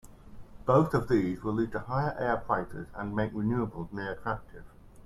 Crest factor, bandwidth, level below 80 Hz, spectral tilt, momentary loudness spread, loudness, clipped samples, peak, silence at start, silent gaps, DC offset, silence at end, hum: 20 dB; 13.5 kHz; -50 dBFS; -8.5 dB/octave; 11 LU; -31 LUFS; under 0.1%; -12 dBFS; 0.05 s; none; under 0.1%; 0.05 s; none